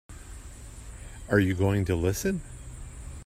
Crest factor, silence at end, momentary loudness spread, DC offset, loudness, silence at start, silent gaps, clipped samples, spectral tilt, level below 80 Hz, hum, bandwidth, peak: 20 dB; 0 s; 20 LU; under 0.1%; -27 LUFS; 0.1 s; none; under 0.1%; -6 dB/octave; -44 dBFS; none; 16 kHz; -8 dBFS